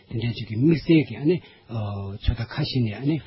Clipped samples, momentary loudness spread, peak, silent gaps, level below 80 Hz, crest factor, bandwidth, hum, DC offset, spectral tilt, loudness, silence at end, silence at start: under 0.1%; 11 LU; -8 dBFS; none; -38 dBFS; 16 dB; 5.8 kHz; none; under 0.1%; -11.5 dB/octave; -24 LUFS; 0 s; 0.1 s